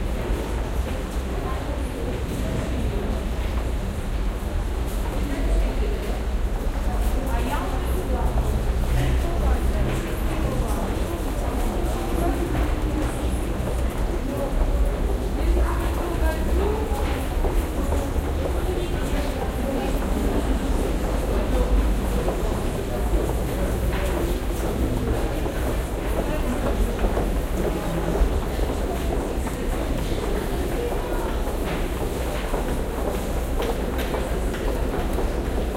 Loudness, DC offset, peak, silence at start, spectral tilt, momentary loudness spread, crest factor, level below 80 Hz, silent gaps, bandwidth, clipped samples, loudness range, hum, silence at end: -26 LUFS; under 0.1%; -8 dBFS; 0 s; -6 dB/octave; 4 LU; 14 dB; -24 dBFS; none; 16 kHz; under 0.1%; 2 LU; none; 0 s